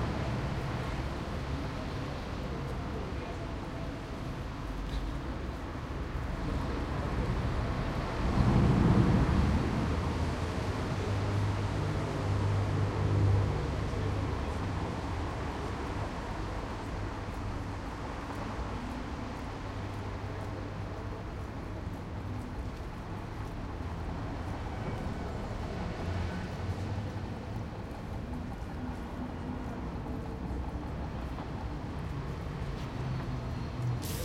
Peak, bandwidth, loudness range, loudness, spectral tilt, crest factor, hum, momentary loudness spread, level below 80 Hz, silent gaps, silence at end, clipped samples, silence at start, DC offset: -12 dBFS; 15 kHz; 10 LU; -35 LUFS; -7 dB/octave; 20 dB; none; 10 LU; -40 dBFS; none; 0 s; under 0.1%; 0 s; under 0.1%